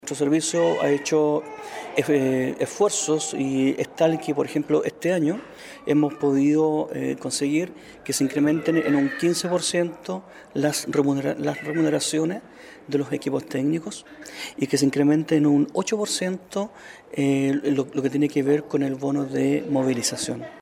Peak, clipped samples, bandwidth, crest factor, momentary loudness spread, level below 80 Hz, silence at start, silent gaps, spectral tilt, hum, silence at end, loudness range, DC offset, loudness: -6 dBFS; under 0.1%; 15.5 kHz; 18 dB; 12 LU; -66 dBFS; 0.05 s; none; -5 dB/octave; none; 0 s; 2 LU; under 0.1%; -23 LUFS